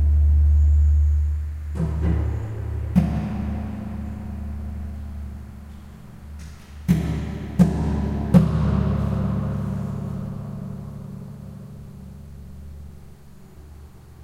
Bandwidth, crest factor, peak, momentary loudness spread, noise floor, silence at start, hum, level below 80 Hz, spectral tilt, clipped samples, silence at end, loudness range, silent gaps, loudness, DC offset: 7.4 kHz; 20 dB; -2 dBFS; 23 LU; -43 dBFS; 0 s; none; -26 dBFS; -9 dB/octave; under 0.1%; 0 s; 14 LU; none; -23 LUFS; under 0.1%